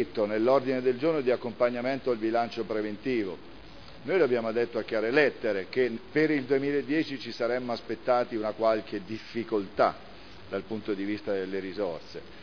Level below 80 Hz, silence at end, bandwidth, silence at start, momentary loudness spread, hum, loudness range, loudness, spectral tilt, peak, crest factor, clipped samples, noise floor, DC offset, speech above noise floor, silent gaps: -64 dBFS; 0 s; 5.4 kHz; 0 s; 12 LU; none; 4 LU; -29 LUFS; -7 dB/octave; -10 dBFS; 20 dB; under 0.1%; -48 dBFS; 0.4%; 20 dB; none